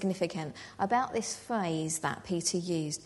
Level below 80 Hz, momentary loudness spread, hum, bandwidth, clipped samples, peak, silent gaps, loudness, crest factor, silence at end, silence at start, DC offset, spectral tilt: -66 dBFS; 5 LU; none; 11.5 kHz; under 0.1%; -16 dBFS; none; -32 LUFS; 18 dB; 0 s; 0 s; under 0.1%; -4 dB/octave